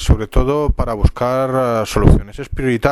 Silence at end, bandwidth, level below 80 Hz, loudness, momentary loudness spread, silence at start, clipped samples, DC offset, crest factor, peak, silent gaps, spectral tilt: 0 s; 17 kHz; -20 dBFS; -17 LUFS; 6 LU; 0 s; 0.2%; under 0.1%; 14 dB; 0 dBFS; none; -7 dB/octave